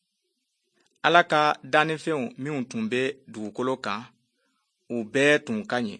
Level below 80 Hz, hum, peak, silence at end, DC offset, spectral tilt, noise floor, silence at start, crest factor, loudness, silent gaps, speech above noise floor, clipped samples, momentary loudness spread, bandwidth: -74 dBFS; none; -2 dBFS; 0.05 s; under 0.1%; -4.5 dB/octave; -77 dBFS; 1.05 s; 24 dB; -25 LUFS; none; 52 dB; under 0.1%; 13 LU; 9.8 kHz